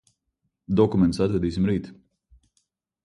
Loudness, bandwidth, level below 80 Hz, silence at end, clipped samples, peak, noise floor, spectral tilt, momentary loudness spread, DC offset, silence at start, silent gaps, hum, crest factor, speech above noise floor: -23 LUFS; 11 kHz; -46 dBFS; 1.1 s; under 0.1%; -6 dBFS; -77 dBFS; -8 dB/octave; 8 LU; under 0.1%; 0.7 s; none; none; 20 dB; 55 dB